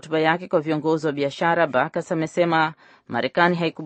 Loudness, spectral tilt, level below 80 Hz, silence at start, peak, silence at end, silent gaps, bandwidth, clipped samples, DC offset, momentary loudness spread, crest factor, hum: -22 LUFS; -6 dB/octave; -70 dBFS; 0.05 s; -2 dBFS; 0 s; none; 8.4 kHz; under 0.1%; under 0.1%; 6 LU; 20 dB; none